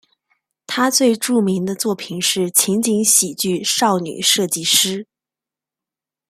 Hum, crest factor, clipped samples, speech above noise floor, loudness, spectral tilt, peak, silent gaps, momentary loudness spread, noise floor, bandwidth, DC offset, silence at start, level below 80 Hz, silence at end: none; 18 dB; under 0.1%; 71 dB; -16 LUFS; -2.5 dB/octave; 0 dBFS; none; 7 LU; -88 dBFS; 16 kHz; under 0.1%; 0.7 s; -64 dBFS; 1.25 s